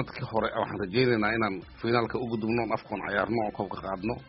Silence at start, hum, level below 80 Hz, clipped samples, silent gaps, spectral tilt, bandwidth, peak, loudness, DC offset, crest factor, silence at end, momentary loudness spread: 0 s; none; -54 dBFS; under 0.1%; none; -4.5 dB/octave; 5.8 kHz; -10 dBFS; -29 LUFS; under 0.1%; 20 dB; 0 s; 8 LU